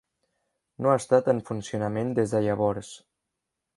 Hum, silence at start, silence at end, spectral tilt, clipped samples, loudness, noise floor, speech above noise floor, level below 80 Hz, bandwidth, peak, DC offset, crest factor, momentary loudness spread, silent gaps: none; 0.8 s; 0.8 s; -6.5 dB/octave; under 0.1%; -26 LUFS; -84 dBFS; 59 dB; -60 dBFS; 11.5 kHz; -6 dBFS; under 0.1%; 20 dB; 10 LU; none